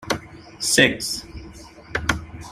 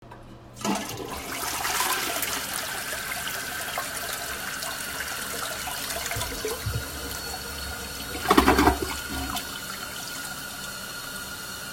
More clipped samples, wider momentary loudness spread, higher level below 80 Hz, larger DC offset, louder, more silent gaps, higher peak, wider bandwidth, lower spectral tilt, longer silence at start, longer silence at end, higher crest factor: neither; first, 23 LU vs 11 LU; about the same, -42 dBFS vs -42 dBFS; neither; first, -21 LUFS vs -28 LUFS; neither; about the same, -2 dBFS vs 0 dBFS; about the same, 15.5 kHz vs 16.5 kHz; about the same, -2.5 dB/octave vs -2.5 dB/octave; about the same, 0 s vs 0 s; about the same, 0 s vs 0 s; about the same, 24 dB vs 28 dB